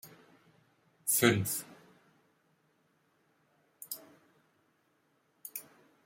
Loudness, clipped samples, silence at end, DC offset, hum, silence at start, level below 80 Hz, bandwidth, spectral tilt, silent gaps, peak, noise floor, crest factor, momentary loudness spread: -32 LUFS; under 0.1%; 0.45 s; under 0.1%; none; 0.05 s; -76 dBFS; 16.5 kHz; -3.5 dB/octave; none; -10 dBFS; -74 dBFS; 30 dB; 26 LU